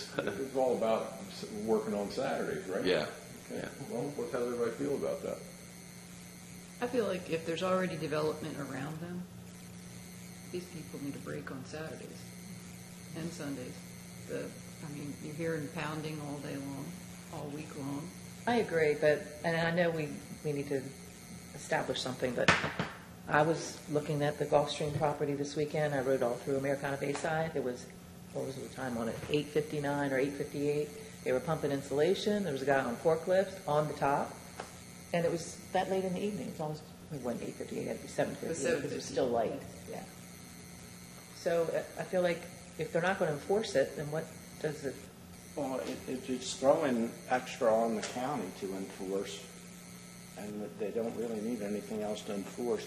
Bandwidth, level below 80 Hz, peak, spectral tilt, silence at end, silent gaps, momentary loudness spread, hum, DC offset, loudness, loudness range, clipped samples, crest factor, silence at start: 13 kHz; -66 dBFS; -10 dBFS; -5 dB/octave; 0 s; none; 17 LU; none; under 0.1%; -35 LUFS; 8 LU; under 0.1%; 26 dB; 0 s